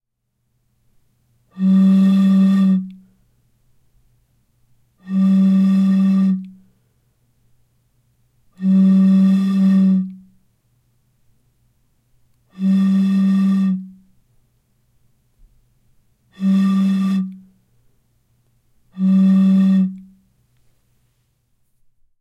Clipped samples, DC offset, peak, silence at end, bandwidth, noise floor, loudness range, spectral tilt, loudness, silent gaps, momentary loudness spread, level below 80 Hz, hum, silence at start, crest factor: under 0.1%; under 0.1%; -8 dBFS; 2.2 s; 5.2 kHz; -72 dBFS; 5 LU; -9 dB/octave; -15 LUFS; none; 10 LU; -66 dBFS; none; 1.55 s; 12 dB